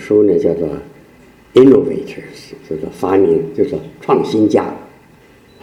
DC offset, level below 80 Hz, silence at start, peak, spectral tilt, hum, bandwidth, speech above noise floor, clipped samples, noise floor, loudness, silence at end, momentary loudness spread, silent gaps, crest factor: under 0.1%; -48 dBFS; 0 s; 0 dBFS; -7.5 dB/octave; none; 11 kHz; 32 dB; 0.1%; -45 dBFS; -14 LUFS; 0.75 s; 20 LU; none; 14 dB